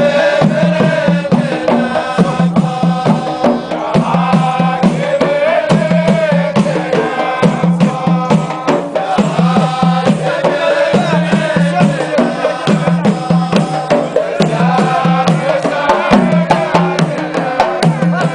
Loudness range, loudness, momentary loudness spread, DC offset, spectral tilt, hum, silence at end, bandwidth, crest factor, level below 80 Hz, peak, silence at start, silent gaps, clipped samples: 1 LU; -12 LUFS; 3 LU; under 0.1%; -7 dB/octave; none; 0 s; 10.5 kHz; 12 dB; -48 dBFS; 0 dBFS; 0 s; none; under 0.1%